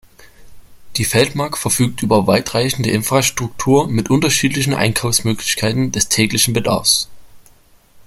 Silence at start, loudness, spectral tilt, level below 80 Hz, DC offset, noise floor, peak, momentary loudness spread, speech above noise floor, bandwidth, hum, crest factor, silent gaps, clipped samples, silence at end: 0.2 s; -15 LUFS; -3.5 dB/octave; -44 dBFS; under 0.1%; -48 dBFS; 0 dBFS; 4 LU; 33 dB; 16.5 kHz; none; 16 dB; none; under 0.1%; 0.05 s